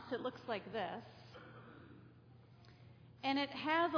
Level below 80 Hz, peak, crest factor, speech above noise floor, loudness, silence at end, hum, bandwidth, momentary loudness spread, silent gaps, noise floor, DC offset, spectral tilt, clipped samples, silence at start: -76 dBFS; -22 dBFS; 20 dB; 23 dB; -40 LUFS; 0 s; none; 5.4 kHz; 25 LU; none; -62 dBFS; under 0.1%; -2.5 dB/octave; under 0.1%; 0 s